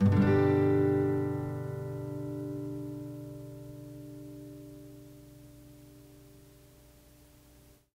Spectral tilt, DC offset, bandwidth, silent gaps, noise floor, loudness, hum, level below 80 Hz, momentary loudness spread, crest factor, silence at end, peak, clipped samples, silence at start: -9 dB/octave; under 0.1%; 16 kHz; none; -59 dBFS; -30 LUFS; none; -60 dBFS; 27 LU; 18 dB; 1.75 s; -14 dBFS; under 0.1%; 0 s